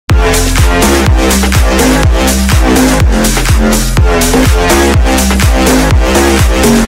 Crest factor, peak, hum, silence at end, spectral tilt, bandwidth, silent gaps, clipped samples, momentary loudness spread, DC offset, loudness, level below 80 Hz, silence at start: 6 dB; 0 dBFS; none; 0 s; -4.5 dB/octave; 16.5 kHz; none; 0.2%; 2 LU; under 0.1%; -8 LUFS; -12 dBFS; 0.1 s